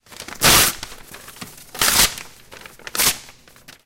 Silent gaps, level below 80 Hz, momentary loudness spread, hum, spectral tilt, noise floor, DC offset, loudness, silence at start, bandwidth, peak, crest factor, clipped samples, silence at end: none; -40 dBFS; 24 LU; none; -0.5 dB/octave; -47 dBFS; under 0.1%; -15 LUFS; 0.2 s; 17 kHz; -2 dBFS; 20 dB; under 0.1%; 0.55 s